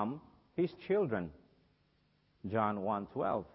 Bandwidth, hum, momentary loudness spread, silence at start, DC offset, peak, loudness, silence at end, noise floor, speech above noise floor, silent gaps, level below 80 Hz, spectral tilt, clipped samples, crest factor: 5.6 kHz; none; 13 LU; 0 s; under 0.1%; -18 dBFS; -36 LUFS; 0.1 s; -73 dBFS; 38 dB; none; -66 dBFS; -6.5 dB/octave; under 0.1%; 20 dB